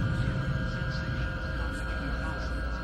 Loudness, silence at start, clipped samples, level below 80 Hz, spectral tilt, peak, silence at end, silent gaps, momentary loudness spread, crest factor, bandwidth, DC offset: -33 LUFS; 0 s; under 0.1%; -34 dBFS; -6.5 dB/octave; -18 dBFS; 0 s; none; 3 LU; 12 dB; 10.5 kHz; under 0.1%